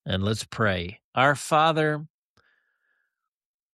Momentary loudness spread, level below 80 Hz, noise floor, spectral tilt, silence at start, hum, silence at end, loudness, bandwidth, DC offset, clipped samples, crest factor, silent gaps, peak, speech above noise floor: 10 LU; -58 dBFS; -81 dBFS; -5 dB/octave; 0.05 s; none; 1.65 s; -24 LUFS; 13 kHz; under 0.1%; under 0.1%; 20 dB; 1.04-1.13 s; -6 dBFS; 57 dB